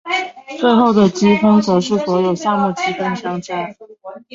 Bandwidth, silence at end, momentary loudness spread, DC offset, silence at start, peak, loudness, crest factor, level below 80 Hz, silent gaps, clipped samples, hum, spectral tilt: 7.6 kHz; 0.15 s; 13 LU; under 0.1%; 0.05 s; -2 dBFS; -15 LUFS; 14 dB; -56 dBFS; none; under 0.1%; none; -6 dB/octave